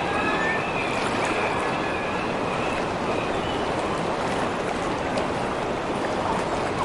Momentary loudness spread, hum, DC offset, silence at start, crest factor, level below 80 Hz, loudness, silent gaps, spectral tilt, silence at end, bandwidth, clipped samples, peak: 3 LU; none; under 0.1%; 0 s; 14 dB; -46 dBFS; -25 LUFS; none; -5 dB/octave; 0 s; 11.5 kHz; under 0.1%; -12 dBFS